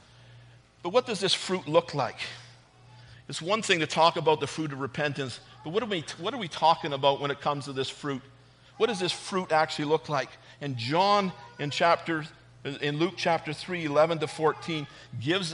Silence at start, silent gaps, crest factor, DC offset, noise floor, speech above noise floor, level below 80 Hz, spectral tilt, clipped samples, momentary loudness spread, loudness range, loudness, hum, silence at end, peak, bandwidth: 0.25 s; none; 20 dB; under 0.1%; -54 dBFS; 26 dB; -68 dBFS; -4.5 dB/octave; under 0.1%; 12 LU; 2 LU; -28 LUFS; none; 0 s; -8 dBFS; 10.5 kHz